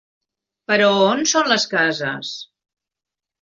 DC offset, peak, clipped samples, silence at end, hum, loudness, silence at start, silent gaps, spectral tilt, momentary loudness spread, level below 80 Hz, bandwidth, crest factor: under 0.1%; -2 dBFS; under 0.1%; 1 s; none; -17 LUFS; 0.7 s; none; -2.5 dB/octave; 15 LU; -66 dBFS; 7.6 kHz; 18 dB